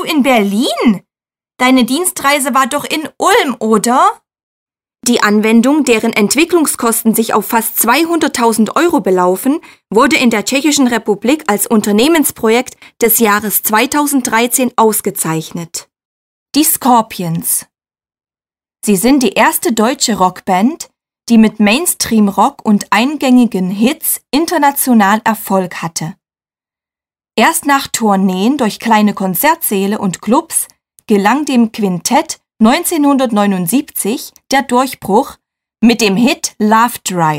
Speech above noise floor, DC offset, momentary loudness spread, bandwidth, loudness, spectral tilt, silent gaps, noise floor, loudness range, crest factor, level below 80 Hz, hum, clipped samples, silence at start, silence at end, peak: over 78 dB; under 0.1%; 7 LU; 16.5 kHz; -12 LUFS; -3.5 dB/octave; 4.43-4.66 s, 16.05-16.46 s; under -90 dBFS; 3 LU; 12 dB; -50 dBFS; none; under 0.1%; 0 s; 0 s; 0 dBFS